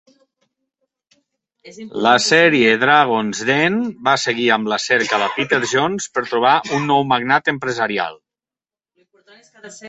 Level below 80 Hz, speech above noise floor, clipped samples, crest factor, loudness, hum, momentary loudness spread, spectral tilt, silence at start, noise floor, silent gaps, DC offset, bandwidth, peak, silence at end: -62 dBFS; over 73 dB; under 0.1%; 18 dB; -16 LUFS; none; 8 LU; -3.5 dB/octave; 1.65 s; under -90 dBFS; none; under 0.1%; 8.4 kHz; 0 dBFS; 0 s